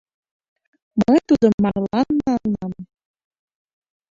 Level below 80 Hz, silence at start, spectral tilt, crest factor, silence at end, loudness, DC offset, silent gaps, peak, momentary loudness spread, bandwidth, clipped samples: -50 dBFS; 0.95 s; -8 dB/octave; 18 dB; 1.3 s; -19 LUFS; under 0.1%; 1.54-1.58 s; -2 dBFS; 12 LU; 7.6 kHz; under 0.1%